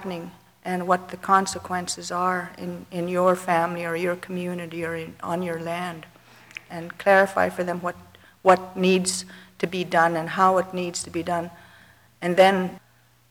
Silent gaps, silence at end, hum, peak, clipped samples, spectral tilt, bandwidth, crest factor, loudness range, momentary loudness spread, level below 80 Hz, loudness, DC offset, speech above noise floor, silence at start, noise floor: none; 0.5 s; none; -2 dBFS; under 0.1%; -4.5 dB/octave; 19.5 kHz; 22 dB; 4 LU; 17 LU; -64 dBFS; -24 LUFS; under 0.1%; 30 dB; 0 s; -53 dBFS